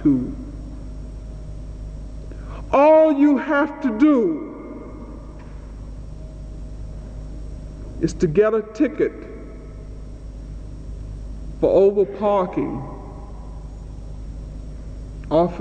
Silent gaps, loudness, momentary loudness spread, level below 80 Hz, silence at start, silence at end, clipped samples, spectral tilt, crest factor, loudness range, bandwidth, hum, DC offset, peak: none; -19 LUFS; 21 LU; -36 dBFS; 0 s; 0 s; under 0.1%; -8 dB/octave; 16 dB; 10 LU; 8.6 kHz; none; under 0.1%; -6 dBFS